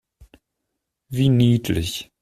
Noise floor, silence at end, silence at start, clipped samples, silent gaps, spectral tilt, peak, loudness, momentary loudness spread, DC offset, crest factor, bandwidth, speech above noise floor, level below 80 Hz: -79 dBFS; 0.2 s; 1.1 s; under 0.1%; none; -6.5 dB/octave; -6 dBFS; -20 LUFS; 12 LU; under 0.1%; 16 dB; 14.5 kHz; 60 dB; -46 dBFS